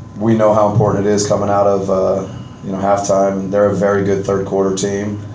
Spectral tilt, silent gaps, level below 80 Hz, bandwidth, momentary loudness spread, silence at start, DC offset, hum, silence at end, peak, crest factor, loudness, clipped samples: -6 dB/octave; none; -42 dBFS; 8 kHz; 8 LU; 0 s; under 0.1%; none; 0 s; 0 dBFS; 14 dB; -15 LUFS; under 0.1%